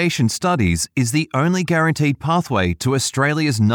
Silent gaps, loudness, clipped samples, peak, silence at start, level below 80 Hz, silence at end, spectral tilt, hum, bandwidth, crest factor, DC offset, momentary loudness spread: none; -18 LUFS; under 0.1%; -4 dBFS; 0 s; -46 dBFS; 0 s; -5 dB/octave; none; 19 kHz; 14 dB; under 0.1%; 2 LU